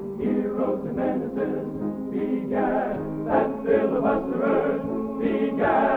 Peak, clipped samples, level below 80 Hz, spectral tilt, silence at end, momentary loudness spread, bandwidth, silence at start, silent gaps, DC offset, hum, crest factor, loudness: -8 dBFS; under 0.1%; -50 dBFS; -9.5 dB/octave; 0 s; 7 LU; 4.5 kHz; 0 s; none; under 0.1%; none; 16 dB; -25 LUFS